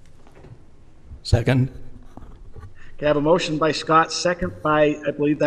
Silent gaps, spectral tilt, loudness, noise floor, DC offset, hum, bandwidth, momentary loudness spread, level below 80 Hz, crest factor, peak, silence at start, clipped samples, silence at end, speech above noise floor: none; -5.5 dB/octave; -20 LUFS; -44 dBFS; under 0.1%; none; 12 kHz; 7 LU; -40 dBFS; 18 dB; -4 dBFS; 0.05 s; under 0.1%; 0 s; 24 dB